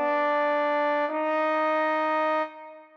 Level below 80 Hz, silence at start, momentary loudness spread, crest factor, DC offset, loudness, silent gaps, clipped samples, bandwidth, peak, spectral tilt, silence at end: -80 dBFS; 0 s; 4 LU; 10 dB; under 0.1%; -25 LUFS; none; under 0.1%; 6.6 kHz; -16 dBFS; -4 dB/octave; 0.1 s